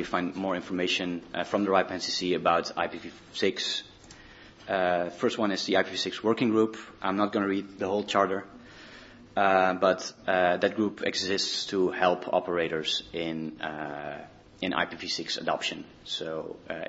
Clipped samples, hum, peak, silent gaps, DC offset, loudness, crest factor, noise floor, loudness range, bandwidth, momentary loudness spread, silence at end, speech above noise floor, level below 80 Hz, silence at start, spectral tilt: under 0.1%; none; -6 dBFS; none; under 0.1%; -28 LUFS; 22 dB; -51 dBFS; 5 LU; 8 kHz; 12 LU; 0 s; 22 dB; -64 dBFS; 0 s; -4 dB/octave